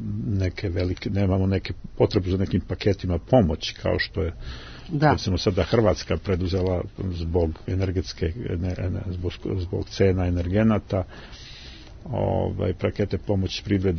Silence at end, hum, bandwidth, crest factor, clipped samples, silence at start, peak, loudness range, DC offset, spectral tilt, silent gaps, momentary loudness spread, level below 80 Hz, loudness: 0 s; none; 6.6 kHz; 20 dB; under 0.1%; 0 s; -4 dBFS; 3 LU; under 0.1%; -7 dB/octave; none; 10 LU; -40 dBFS; -25 LUFS